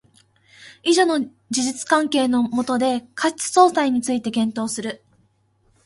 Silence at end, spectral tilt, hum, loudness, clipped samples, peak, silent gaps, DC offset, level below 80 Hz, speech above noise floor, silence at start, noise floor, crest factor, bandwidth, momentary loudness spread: 0.9 s; -3 dB/octave; none; -20 LUFS; under 0.1%; 0 dBFS; none; under 0.1%; -64 dBFS; 42 dB; 0.6 s; -62 dBFS; 20 dB; 11.5 kHz; 10 LU